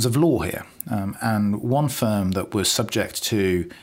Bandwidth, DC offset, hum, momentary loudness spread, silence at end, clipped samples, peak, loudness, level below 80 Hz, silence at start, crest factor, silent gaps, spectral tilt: 16.5 kHz; under 0.1%; none; 7 LU; 0.05 s; under 0.1%; -6 dBFS; -23 LUFS; -50 dBFS; 0 s; 16 dB; none; -5 dB/octave